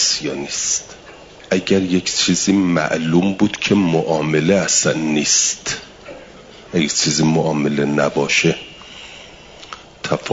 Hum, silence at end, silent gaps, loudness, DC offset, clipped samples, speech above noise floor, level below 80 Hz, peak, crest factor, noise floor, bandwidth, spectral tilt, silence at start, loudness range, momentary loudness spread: none; 0 s; none; -17 LUFS; under 0.1%; under 0.1%; 23 dB; -52 dBFS; -2 dBFS; 16 dB; -40 dBFS; 7.8 kHz; -3.5 dB/octave; 0 s; 2 LU; 21 LU